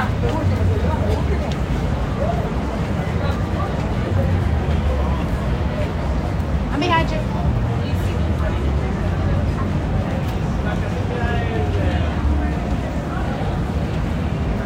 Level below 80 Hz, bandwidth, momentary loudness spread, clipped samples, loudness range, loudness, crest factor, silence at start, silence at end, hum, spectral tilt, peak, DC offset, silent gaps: -24 dBFS; 10.5 kHz; 3 LU; under 0.1%; 1 LU; -21 LUFS; 16 dB; 0 s; 0 s; none; -7.5 dB/octave; -4 dBFS; under 0.1%; none